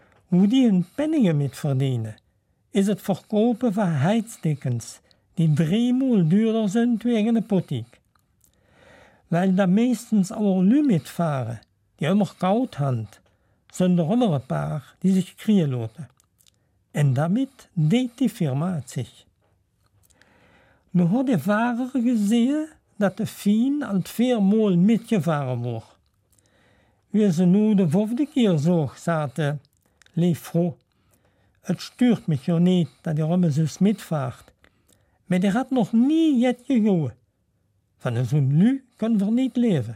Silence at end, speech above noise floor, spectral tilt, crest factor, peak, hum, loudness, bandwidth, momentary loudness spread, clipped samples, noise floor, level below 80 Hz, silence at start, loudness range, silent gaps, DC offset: 0 s; 47 dB; -7.5 dB/octave; 14 dB; -10 dBFS; none; -22 LUFS; 15.5 kHz; 11 LU; under 0.1%; -68 dBFS; -64 dBFS; 0.3 s; 3 LU; none; under 0.1%